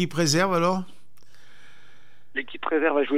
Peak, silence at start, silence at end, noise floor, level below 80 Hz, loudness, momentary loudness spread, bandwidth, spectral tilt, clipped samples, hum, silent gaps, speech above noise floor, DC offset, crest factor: -8 dBFS; 0 s; 0 s; -59 dBFS; -66 dBFS; -24 LUFS; 12 LU; 16 kHz; -4.5 dB/octave; under 0.1%; none; none; 35 dB; 2%; 18 dB